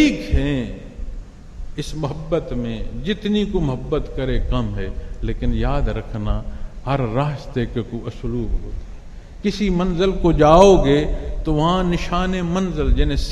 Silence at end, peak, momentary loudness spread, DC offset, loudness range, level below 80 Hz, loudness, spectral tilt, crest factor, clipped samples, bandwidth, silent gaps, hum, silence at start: 0 s; 0 dBFS; 15 LU; under 0.1%; 9 LU; -24 dBFS; -20 LUFS; -6.5 dB/octave; 20 dB; under 0.1%; 11 kHz; none; none; 0 s